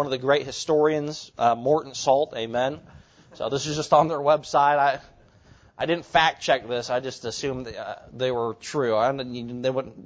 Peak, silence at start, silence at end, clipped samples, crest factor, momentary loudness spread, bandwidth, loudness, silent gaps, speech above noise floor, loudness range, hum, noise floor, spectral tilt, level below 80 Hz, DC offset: -4 dBFS; 0 s; 0 s; under 0.1%; 20 dB; 12 LU; 8 kHz; -24 LUFS; none; 30 dB; 4 LU; none; -54 dBFS; -4.5 dB/octave; -58 dBFS; under 0.1%